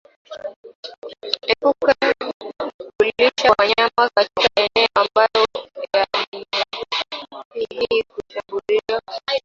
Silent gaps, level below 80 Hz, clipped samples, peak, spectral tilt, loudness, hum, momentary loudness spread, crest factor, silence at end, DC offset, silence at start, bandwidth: 0.56-0.63 s, 0.75-0.83 s, 0.98-1.02 s, 2.34-2.40 s, 2.74-2.79 s, 6.27-6.32 s, 7.45-7.51 s; -56 dBFS; under 0.1%; -2 dBFS; -2.5 dB/octave; -19 LUFS; none; 17 LU; 18 dB; 0.05 s; under 0.1%; 0.3 s; 7.6 kHz